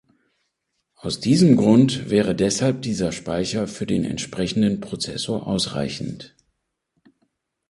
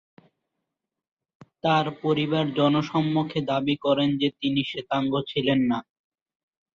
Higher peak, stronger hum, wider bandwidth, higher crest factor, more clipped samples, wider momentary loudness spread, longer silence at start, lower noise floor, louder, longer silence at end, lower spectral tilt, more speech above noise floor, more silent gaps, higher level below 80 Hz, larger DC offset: first, -2 dBFS vs -8 dBFS; neither; first, 11.5 kHz vs 7.2 kHz; about the same, 20 dB vs 18 dB; neither; first, 13 LU vs 4 LU; second, 1.05 s vs 1.65 s; second, -75 dBFS vs -85 dBFS; first, -21 LUFS vs -24 LUFS; first, 1.4 s vs 0.95 s; second, -5.5 dB/octave vs -7.5 dB/octave; second, 55 dB vs 61 dB; neither; first, -50 dBFS vs -64 dBFS; neither